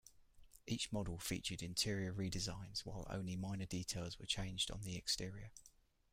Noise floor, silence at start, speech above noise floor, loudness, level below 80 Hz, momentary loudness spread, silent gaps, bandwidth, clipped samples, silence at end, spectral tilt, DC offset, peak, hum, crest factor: -64 dBFS; 0.05 s; 20 dB; -43 LUFS; -58 dBFS; 8 LU; none; 16 kHz; under 0.1%; 0.45 s; -3.5 dB/octave; under 0.1%; -24 dBFS; none; 22 dB